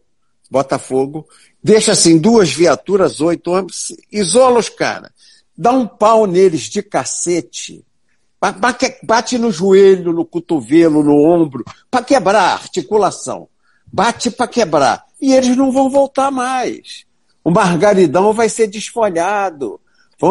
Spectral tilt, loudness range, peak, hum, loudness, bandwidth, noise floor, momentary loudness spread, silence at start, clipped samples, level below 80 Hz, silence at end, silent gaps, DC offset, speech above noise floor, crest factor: -4.5 dB/octave; 3 LU; 0 dBFS; none; -13 LUFS; 11.5 kHz; -66 dBFS; 12 LU; 0.5 s; under 0.1%; -52 dBFS; 0 s; none; 0.1%; 53 dB; 14 dB